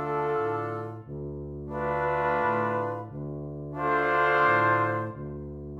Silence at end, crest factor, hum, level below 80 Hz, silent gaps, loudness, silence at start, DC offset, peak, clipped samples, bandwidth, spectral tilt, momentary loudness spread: 0 s; 16 dB; none; -50 dBFS; none; -27 LUFS; 0 s; under 0.1%; -12 dBFS; under 0.1%; 8.4 kHz; -8 dB/octave; 16 LU